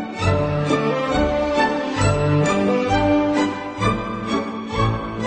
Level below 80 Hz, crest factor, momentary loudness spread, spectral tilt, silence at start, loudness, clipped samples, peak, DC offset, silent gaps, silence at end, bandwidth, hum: -36 dBFS; 14 dB; 6 LU; -6 dB/octave; 0 s; -20 LUFS; under 0.1%; -4 dBFS; under 0.1%; none; 0 s; 9 kHz; none